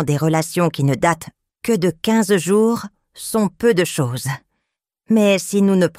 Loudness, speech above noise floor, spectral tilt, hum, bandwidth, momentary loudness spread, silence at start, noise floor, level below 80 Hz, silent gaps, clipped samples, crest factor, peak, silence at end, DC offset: -18 LUFS; 60 dB; -5.5 dB/octave; none; 16 kHz; 11 LU; 0 s; -77 dBFS; -54 dBFS; none; under 0.1%; 16 dB; -2 dBFS; 0.1 s; under 0.1%